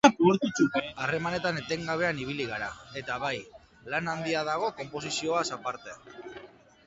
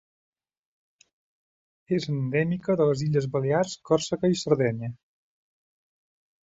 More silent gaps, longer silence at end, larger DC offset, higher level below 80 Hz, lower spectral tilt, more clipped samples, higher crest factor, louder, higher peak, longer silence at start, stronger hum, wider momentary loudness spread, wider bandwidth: neither; second, 0.4 s vs 1.55 s; neither; about the same, -62 dBFS vs -64 dBFS; second, -4.5 dB/octave vs -6.5 dB/octave; neither; first, 26 dB vs 20 dB; second, -30 LUFS vs -26 LUFS; first, -4 dBFS vs -8 dBFS; second, 0.05 s vs 1.9 s; neither; first, 18 LU vs 5 LU; first, 9 kHz vs 8 kHz